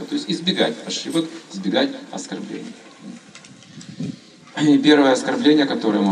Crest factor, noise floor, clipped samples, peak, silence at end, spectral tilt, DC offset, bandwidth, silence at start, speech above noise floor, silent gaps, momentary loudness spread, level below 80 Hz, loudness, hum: 20 dB; -44 dBFS; under 0.1%; 0 dBFS; 0 s; -4.5 dB/octave; under 0.1%; 10.5 kHz; 0 s; 25 dB; none; 25 LU; -74 dBFS; -19 LUFS; none